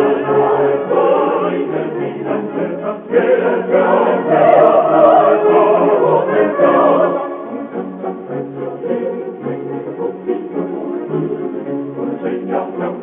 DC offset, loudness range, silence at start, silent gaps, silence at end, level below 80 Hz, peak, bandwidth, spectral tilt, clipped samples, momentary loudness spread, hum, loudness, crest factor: under 0.1%; 11 LU; 0 s; none; 0 s; -64 dBFS; 0 dBFS; 3.8 kHz; -10.5 dB/octave; under 0.1%; 14 LU; none; -15 LUFS; 14 dB